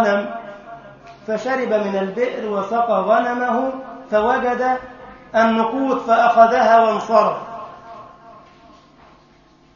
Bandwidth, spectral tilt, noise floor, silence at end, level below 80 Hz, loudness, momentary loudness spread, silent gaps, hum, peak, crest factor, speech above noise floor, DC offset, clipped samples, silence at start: 7.2 kHz; -5.5 dB/octave; -51 dBFS; 1.45 s; -56 dBFS; -18 LUFS; 23 LU; none; none; 0 dBFS; 18 dB; 34 dB; under 0.1%; under 0.1%; 0 s